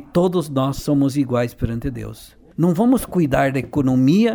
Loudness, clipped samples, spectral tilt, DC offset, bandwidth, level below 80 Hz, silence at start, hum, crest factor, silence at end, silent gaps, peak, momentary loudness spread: -19 LUFS; under 0.1%; -7 dB/octave; under 0.1%; over 20 kHz; -40 dBFS; 0 s; none; 14 dB; 0 s; none; -4 dBFS; 11 LU